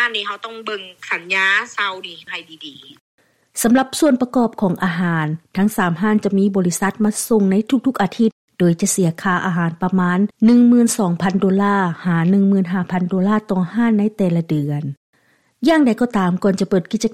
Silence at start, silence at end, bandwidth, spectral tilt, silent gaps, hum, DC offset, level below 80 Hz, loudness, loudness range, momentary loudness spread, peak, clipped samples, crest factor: 0 s; 0 s; 15.5 kHz; -5.5 dB/octave; 3.00-3.18 s, 8.32-8.48 s, 14.97-15.13 s; none; under 0.1%; -54 dBFS; -17 LUFS; 4 LU; 11 LU; -4 dBFS; under 0.1%; 14 dB